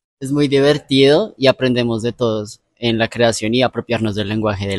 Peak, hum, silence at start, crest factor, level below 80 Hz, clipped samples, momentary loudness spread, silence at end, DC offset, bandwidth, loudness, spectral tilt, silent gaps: 0 dBFS; none; 0.2 s; 16 dB; -48 dBFS; under 0.1%; 7 LU; 0 s; under 0.1%; 12 kHz; -16 LUFS; -5.5 dB/octave; none